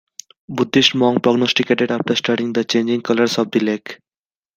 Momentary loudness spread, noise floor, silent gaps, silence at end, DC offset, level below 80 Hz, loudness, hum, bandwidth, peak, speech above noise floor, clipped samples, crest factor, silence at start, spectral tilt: 8 LU; under -90 dBFS; none; 0.6 s; under 0.1%; -62 dBFS; -17 LUFS; none; 15.5 kHz; 0 dBFS; over 73 dB; under 0.1%; 18 dB; 0.5 s; -4.5 dB/octave